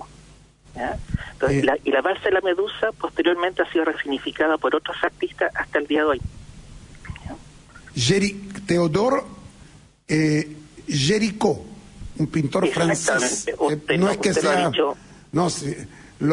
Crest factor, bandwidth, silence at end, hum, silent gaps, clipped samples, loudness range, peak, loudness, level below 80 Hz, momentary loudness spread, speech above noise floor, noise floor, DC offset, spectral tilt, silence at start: 18 dB; 11 kHz; 0 s; none; none; under 0.1%; 3 LU; -6 dBFS; -22 LUFS; -46 dBFS; 17 LU; 28 dB; -49 dBFS; under 0.1%; -4.5 dB/octave; 0 s